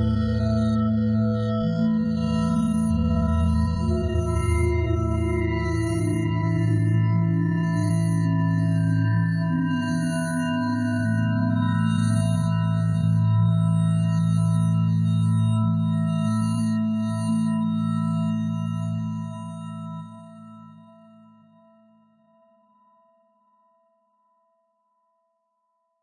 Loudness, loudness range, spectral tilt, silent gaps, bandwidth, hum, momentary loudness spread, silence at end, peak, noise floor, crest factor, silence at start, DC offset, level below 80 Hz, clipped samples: -23 LUFS; 7 LU; -8 dB/octave; none; 11 kHz; none; 5 LU; 5.3 s; -12 dBFS; -74 dBFS; 12 dB; 0 s; under 0.1%; -40 dBFS; under 0.1%